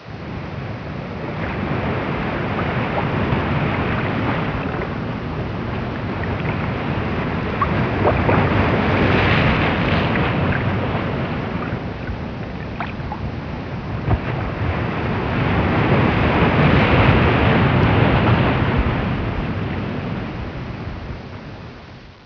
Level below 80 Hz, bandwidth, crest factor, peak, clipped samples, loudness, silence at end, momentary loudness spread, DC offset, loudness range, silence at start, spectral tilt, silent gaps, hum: -32 dBFS; 5.4 kHz; 18 dB; -2 dBFS; under 0.1%; -20 LUFS; 0 s; 13 LU; under 0.1%; 9 LU; 0 s; -8.5 dB/octave; none; none